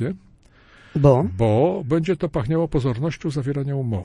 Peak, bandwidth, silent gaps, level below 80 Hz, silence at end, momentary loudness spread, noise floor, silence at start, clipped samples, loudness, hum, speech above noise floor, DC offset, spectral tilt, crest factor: -2 dBFS; 10.5 kHz; none; -42 dBFS; 0 s; 9 LU; -52 dBFS; 0 s; under 0.1%; -21 LUFS; none; 31 dB; under 0.1%; -8.5 dB/octave; 18 dB